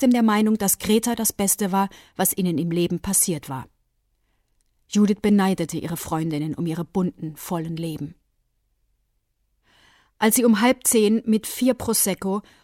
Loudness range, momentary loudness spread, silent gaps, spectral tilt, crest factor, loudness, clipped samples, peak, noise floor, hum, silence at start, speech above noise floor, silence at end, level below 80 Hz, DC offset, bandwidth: 9 LU; 11 LU; none; -4.5 dB/octave; 18 dB; -21 LUFS; under 0.1%; -4 dBFS; -71 dBFS; none; 0 s; 49 dB; 0.25 s; -54 dBFS; under 0.1%; 17 kHz